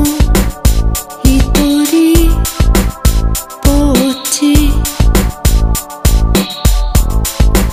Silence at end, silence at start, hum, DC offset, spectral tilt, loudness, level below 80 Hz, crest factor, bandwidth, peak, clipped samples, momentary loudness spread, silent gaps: 0 s; 0 s; none; 2%; -5 dB/octave; -12 LUFS; -12 dBFS; 10 dB; 16 kHz; 0 dBFS; 0.3%; 4 LU; none